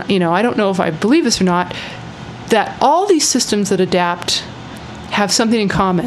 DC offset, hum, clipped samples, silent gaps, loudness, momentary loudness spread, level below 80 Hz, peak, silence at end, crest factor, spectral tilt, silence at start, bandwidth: under 0.1%; none; under 0.1%; none; -15 LUFS; 17 LU; -44 dBFS; 0 dBFS; 0 s; 16 dB; -4 dB/octave; 0 s; 13.5 kHz